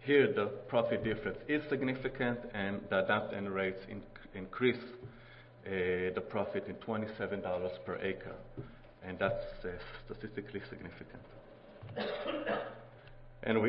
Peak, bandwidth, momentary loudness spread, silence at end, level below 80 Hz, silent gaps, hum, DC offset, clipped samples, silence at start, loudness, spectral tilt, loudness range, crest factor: -14 dBFS; 5.6 kHz; 18 LU; 0 s; -58 dBFS; none; none; under 0.1%; under 0.1%; 0 s; -36 LUFS; -4.5 dB/octave; 8 LU; 22 dB